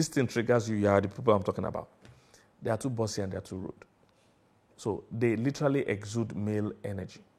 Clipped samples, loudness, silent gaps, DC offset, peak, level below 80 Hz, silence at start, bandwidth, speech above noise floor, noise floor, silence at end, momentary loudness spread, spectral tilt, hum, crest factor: under 0.1%; -31 LUFS; none; under 0.1%; -8 dBFS; -64 dBFS; 0 s; 14.5 kHz; 36 dB; -66 dBFS; 0.2 s; 12 LU; -6 dB/octave; none; 22 dB